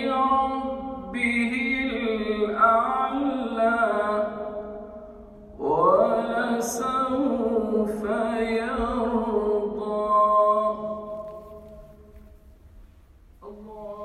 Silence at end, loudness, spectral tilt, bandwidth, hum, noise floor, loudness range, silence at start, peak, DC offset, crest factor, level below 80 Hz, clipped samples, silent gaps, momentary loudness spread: 0 s; -24 LUFS; -5 dB/octave; 14 kHz; none; -52 dBFS; 3 LU; 0 s; -6 dBFS; under 0.1%; 18 dB; -50 dBFS; under 0.1%; none; 19 LU